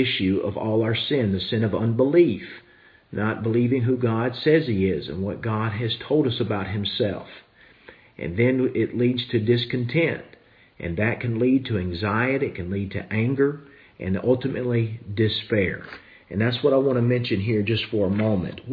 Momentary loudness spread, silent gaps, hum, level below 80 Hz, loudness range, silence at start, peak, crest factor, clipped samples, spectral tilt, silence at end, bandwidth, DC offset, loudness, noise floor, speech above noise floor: 9 LU; none; none; -54 dBFS; 3 LU; 0 s; -6 dBFS; 16 dB; under 0.1%; -9.5 dB/octave; 0 s; 5 kHz; under 0.1%; -23 LUFS; -50 dBFS; 27 dB